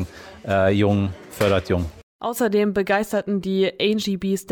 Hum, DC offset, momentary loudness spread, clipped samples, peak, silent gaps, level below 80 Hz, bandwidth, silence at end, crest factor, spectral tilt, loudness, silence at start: none; under 0.1%; 9 LU; under 0.1%; -6 dBFS; 2.03-2.19 s; -46 dBFS; 20 kHz; 0 s; 16 dB; -6 dB/octave; -22 LUFS; 0 s